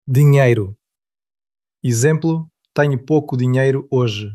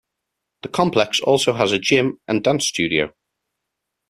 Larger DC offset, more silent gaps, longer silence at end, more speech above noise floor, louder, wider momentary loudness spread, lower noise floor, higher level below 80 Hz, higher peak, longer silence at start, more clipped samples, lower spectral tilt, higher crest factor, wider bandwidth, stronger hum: neither; neither; second, 0 s vs 1 s; first, 72 dB vs 61 dB; about the same, -17 LUFS vs -19 LUFS; first, 12 LU vs 7 LU; first, -88 dBFS vs -80 dBFS; about the same, -60 dBFS vs -56 dBFS; about the same, -2 dBFS vs -2 dBFS; second, 0.05 s vs 0.65 s; neither; first, -6.5 dB/octave vs -4 dB/octave; about the same, 16 dB vs 18 dB; about the same, 14.5 kHz vs 14 kHz; neither